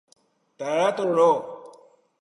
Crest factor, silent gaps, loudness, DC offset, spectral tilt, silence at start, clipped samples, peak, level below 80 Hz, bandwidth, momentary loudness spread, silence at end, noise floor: 18 dB; none; -22 LUFS; under 0.1%; -5 dB/octave; 0.6 s; under 0.1%; -8 dBFS; -80 dBFS; 11 kHz; 19 LU; 0.55 s; -54 dBFS